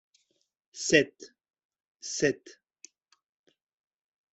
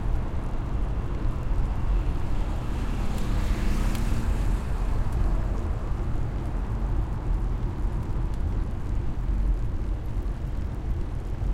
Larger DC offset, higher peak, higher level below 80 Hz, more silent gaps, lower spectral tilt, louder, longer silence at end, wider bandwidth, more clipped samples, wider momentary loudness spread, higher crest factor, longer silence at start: neither; first, -6 dBFS vs -12 dBFS; second, -70 dBFS vs -28 dBFS; first, 1.65-1.69 s, 1.88-1.95 s vs none; second, -3 dB/octave vs -7.5 dB/octave; about the same, -28 LUFS vs -30 LUFS; first, 1.8 s vs 0 s; second, 8.2 kHz vs 12 kHz; neither; first, 18 LU vs 4 LU; first, 28 dB vs 12 dB; first, 0.75 s vs 0 s